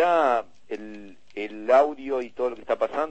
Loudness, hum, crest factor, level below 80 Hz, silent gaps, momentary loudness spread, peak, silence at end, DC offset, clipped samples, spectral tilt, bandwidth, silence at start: -24 LUFS; none; 16 dB; -64 dBFS; none; 18 LU; -8 dBFS; 0 s; 0.5%; under 0.1%; -5 dB/octave; 8.4 kHz; 0 s